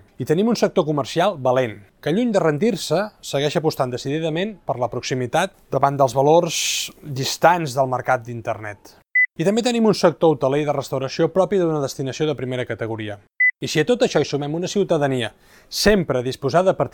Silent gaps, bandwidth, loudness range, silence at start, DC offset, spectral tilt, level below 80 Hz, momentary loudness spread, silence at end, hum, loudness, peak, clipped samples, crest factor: none; 18 kHz; 3 LU; 0.2 s; under 0.1%; -5 dB/octave; -48 dBFS; 9 LU; 0.05 s; none; -20 LUFS; -2 dBFS; under 0.1%; 18 dB